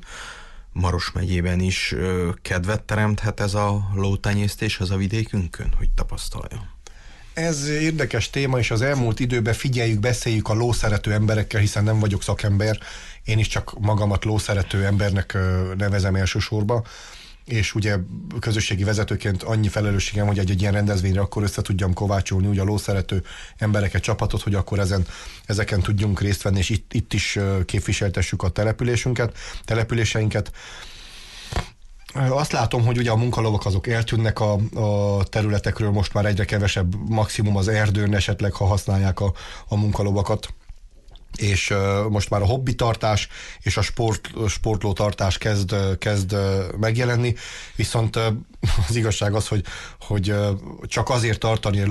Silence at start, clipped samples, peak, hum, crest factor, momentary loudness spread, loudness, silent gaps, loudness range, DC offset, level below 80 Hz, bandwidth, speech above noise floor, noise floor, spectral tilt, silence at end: 0 s; under 0.1%; -10 dBFS; none; 12 dB; 8 LU; -22 LUFS; none; 3 LU; under 0.1%; -32 dBFS; 12.5 kHz; 23 dB; -44 dBFS; -5.5 dB/octave; 0 s